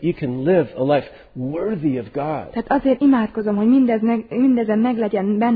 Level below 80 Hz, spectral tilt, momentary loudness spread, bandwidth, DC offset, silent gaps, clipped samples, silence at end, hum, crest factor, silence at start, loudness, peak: -50 dBFS; -11.5 dB/octave; 9 LU; 4.8 kHz; under 0.1%; none; under 0.1%; 0 s; none; 14 dB; 0 s; -19 LUFS; -4 dBFS